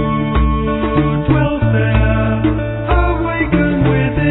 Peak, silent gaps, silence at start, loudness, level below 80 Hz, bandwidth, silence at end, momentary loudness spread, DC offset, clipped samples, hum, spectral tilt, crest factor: 0 dBFS; none; 0 s; -15 LUFS; -20 dBFS; 4.1 kHz; 0 s; 3 LU; under 0.1%; under 0.1%; none; -11.5 dB/octave; 14 dB